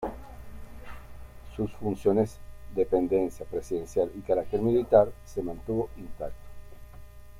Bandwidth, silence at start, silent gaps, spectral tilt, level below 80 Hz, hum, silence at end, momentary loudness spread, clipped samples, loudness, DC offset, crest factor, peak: 16 kHz; 0 s; none; -8 dB/octave; -48 dBFS; none; 0 s; 25 LU; under 0.1%; -28 LUFS; under 0.1%; 24 dB; -6 dBFS